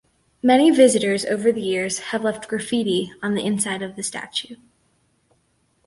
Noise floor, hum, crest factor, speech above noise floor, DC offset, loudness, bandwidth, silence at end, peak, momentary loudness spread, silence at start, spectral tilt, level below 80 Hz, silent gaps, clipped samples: -65 dBFS; none; 20 dB; 45 dB; under 0.1%; -20 LUFS; 11.5 kHz; 1.3 s; -2 dBFS; 12 LU; 0.45 s; -4 dB/octave; -62 dBFS; none; under 0.1%